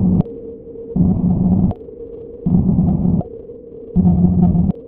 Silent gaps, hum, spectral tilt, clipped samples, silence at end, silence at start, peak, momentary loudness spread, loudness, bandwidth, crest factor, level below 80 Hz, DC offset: none; none; -15.5 dB/octave; under 0.1%; 0 s; 0 s; 0 dBFS; 19 LU; -16 LUFS; 1.4 kHz; 16 dB; -30 dBFS; under 0.1%